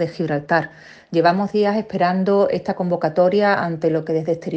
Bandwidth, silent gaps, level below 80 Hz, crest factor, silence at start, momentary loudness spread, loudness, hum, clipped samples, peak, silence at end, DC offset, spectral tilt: 8 kHz; none; -60 dBFS; 16 dB; 0 s; 5 LU; -19 LUFS; none; under 0.1%; -2 dBFS; 0 s; under 0.1%; -8 dB/octave